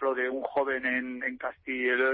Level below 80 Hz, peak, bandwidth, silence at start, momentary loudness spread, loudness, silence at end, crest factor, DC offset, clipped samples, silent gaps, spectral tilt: -68 dBFS; -16 dBFS; 4.5 kHz; 0 s; 6 LU; -30 LUFS; 0 s; 14 dB; under 0.1%; under 0.1%; none; -7.5 dB/octave